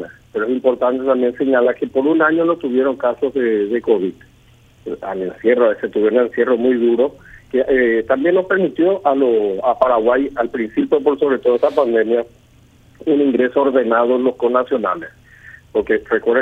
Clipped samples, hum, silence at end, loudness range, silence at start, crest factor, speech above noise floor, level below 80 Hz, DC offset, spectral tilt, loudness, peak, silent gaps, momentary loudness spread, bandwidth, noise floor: under 0.1%; none; 0 s; 2 LU; 0 s; 16 dB; 33 dB; -52 dBFS; under 0.1%; -7.5 dB/octave; -17 LUFS; 0 dBFS; none; 8 LU; 4.5 kHz; -49 dBFS